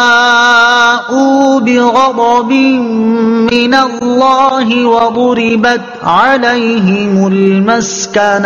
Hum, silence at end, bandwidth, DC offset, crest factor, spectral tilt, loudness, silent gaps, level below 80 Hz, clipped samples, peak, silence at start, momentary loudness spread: none; 0 s; 7.4 kHz; under 0.1%; 8 dB; -4.5 dB/octave; -9 LUFS; none; -48 dBFS; 0.4%; 0 dBFS; 0 s; 5 LU